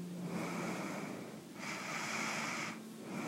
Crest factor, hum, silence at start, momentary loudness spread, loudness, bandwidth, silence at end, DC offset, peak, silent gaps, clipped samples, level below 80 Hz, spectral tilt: 16 dB; none; 0 s; 9 LU; -41 LUFS; 16 kHz; 0 s; under 0.1%; -26 dBFS; none; under 0.1%; -82 dBFS; -4 dB/octave